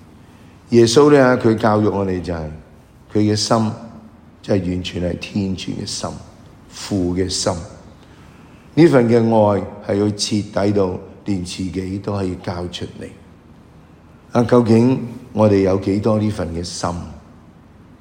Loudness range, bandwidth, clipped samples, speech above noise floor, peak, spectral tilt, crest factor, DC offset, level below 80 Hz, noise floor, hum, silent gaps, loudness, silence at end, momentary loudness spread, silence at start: 8 LU; 16 kHz; under 0.1%; 28 dB; 0 dBFS; -6 dB/octave; 18 dB; under 0.1%; -46 dBFS; -45 dBFS; none; none; -17 LUFS; 0.8 s; 17 LU; 0.7 s